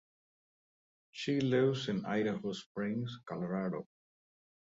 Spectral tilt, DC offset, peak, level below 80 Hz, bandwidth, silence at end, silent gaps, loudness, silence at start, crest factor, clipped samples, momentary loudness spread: -6.5 dB/octave; under 0.1%; -20 dBFS; -74 dBFS; 8 kHz; 0.95 s; 2.66-2.75 s; -35 LUFS; 1.15 s; 18 dB; under 0.1%; 11 LU